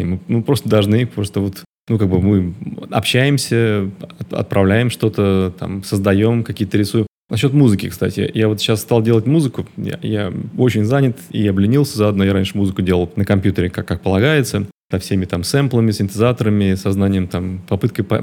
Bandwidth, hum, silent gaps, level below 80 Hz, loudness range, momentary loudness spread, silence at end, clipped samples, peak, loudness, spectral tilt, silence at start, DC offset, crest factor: 17.5 kHz; none; 1.66-1.87 s, 7.10-7.27 s, 14.74-14.89 s; -46 dBFS; 1 LU; 8 LU; 0 s; under 0.1%; 0 dBFS; -17 LUFS; -6.5 dB/octave; 0 s; under 0.1%; 16 dB